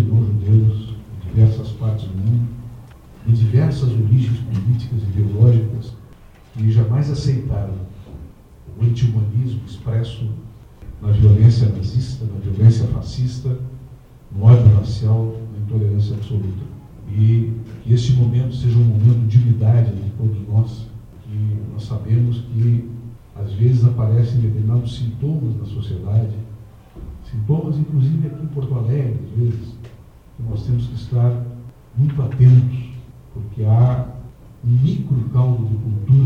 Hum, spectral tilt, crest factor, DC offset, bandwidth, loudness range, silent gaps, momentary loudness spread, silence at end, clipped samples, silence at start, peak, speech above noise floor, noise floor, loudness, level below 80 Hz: none; -9.5 dB/octave; 16 dB; under 0.1%; 6.6 kHz; 6 LU; none; 17 LU; 0 s; under 0.1%; 0 s; -2 dBFS; 27 dB; -43 dBFS; -18 LUFS; -38 dBFS